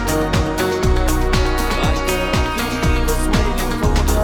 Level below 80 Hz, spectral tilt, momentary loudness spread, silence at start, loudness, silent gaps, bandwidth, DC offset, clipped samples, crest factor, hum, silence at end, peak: -20 dBFS; -5 dB/octave; 1 LU; 0 s; -18 LUFS; none; 19 kHz; under 0.1%; under 0.1%; 14 dB; none; 0 s; -2 dBFS